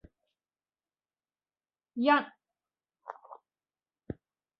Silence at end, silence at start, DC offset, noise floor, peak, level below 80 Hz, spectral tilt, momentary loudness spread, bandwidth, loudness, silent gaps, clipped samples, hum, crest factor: 1.25 s; 1.95 s; under 0.1%; under -90 dBFS; -10 dBFS; -68 dBFS; -2.5 dB/octave; 23 LU; 5.6 kHz; -28 LUFS; none; under 0.1%; none; 26 dB